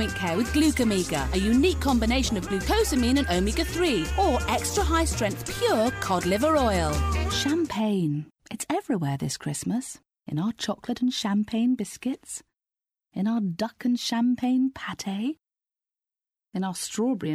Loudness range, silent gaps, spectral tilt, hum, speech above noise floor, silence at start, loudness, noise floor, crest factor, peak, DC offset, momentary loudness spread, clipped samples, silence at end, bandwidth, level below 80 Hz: 5 LU; none; -5 dB/octave; none; 63 dB; 0 s; -26 LUFS; -88 dBFS; 14 dB; -10 dBFS; under 0.1%; 9 LU; under 0.1%; 0 s; 16 kHz; -38 dBFS